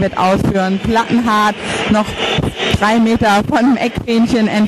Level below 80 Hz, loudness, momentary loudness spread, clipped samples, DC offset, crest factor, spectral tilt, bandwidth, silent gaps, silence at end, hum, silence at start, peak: -34 dBFS; -14 LUFS; 4 LU; under 0.1%; under 0.1%; 14 dB; -5.5 dB/octave; 13 kHz; none; 0 s; none; 0 s; 0 dBFS